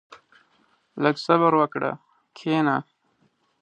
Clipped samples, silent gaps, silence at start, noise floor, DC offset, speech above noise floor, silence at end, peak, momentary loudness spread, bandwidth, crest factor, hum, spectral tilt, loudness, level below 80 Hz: under 0.1%; none; 0.1 s; -67 dBFS; under 0.1%; 45 dB; 0.8 s; -4 dBFS; 15 LU; 8.8 kHz; 22 dB; none; -7 dB/octave; -23 LUFS; -74 dBFS